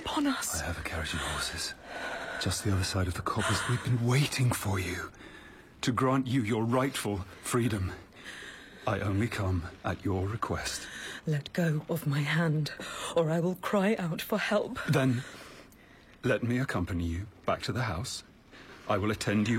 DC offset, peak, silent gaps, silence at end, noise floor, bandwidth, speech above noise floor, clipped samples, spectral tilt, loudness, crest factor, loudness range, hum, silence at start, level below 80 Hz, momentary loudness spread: under 0.1%; -14 dBFS; none; 0 s; -55 dBFS; 16 kHz; 25 dB; under 0.1%; -5 dB/octave; -31 LUFS; 16 dB; 3 LU; none; 0 s; -54 dBFS; 10 LU